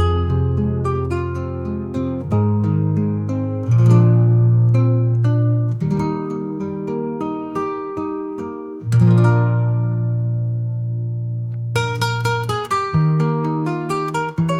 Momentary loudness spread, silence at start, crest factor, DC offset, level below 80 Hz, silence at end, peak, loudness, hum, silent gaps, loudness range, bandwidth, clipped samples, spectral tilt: 11 LU; 0 s; 16 dB; under 0.1%; -46 dBFS; 0 s; -2 dBFS; -19 LUFS; none; none; 5 LU; 11 kHz; under 0.1%; -8 dB/octave